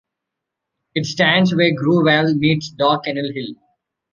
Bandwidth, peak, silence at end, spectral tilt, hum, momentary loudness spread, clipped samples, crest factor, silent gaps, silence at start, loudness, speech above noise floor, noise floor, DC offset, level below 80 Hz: 7.4 kHz; -2 dBFS; 0.6 s; -6 dB/octave; none; 12 LU; under 0.1%; 18 dB; none; 0.95 s; -17 LUFS; 65 dB; -81 dBFS; under 0.1%; -58 dBFS